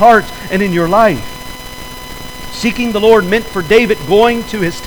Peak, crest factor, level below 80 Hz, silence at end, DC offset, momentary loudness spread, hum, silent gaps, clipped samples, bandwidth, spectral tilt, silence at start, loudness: 0 dBFS; 12 dB; -34 dBFS; 0 s; under 0.1%; 18 LU; none; none; under 0.1%; over 20 kHz; -5 dB/octave; 0 s; -12 LUFS